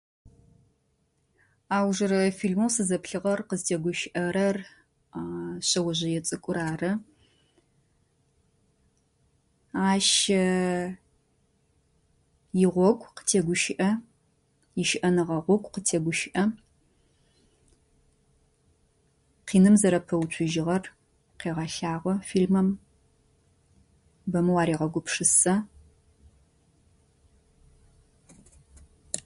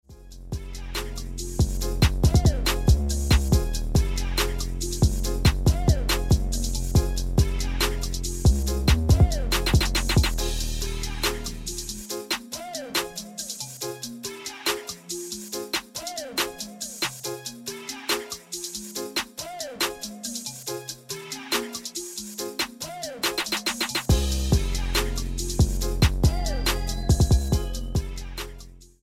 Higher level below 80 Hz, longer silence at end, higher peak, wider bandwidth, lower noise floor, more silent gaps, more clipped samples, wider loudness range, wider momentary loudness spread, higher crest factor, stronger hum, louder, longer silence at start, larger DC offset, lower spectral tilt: second, -60 dBFS vs -28 dBFS; about the same, 0.05 s vs 0.15 s; about the same, -8 dBFS vs -6 dBFS; second, 11.5 kHz vs 16.5 kHz; first, -71 dBFS vs -44 dBFS; neither; neither; about the same, 6 LU vs 7 LU; about the same, 14 LU vs 12 LU; about the same, 20 dB vs 18 dB; neither; about the same, -26 LUFS vs -26 LUFS; first, 1.7 s vs 0.1 s; neither; about the same, -4.5 dB/octave vs -4 dB/octave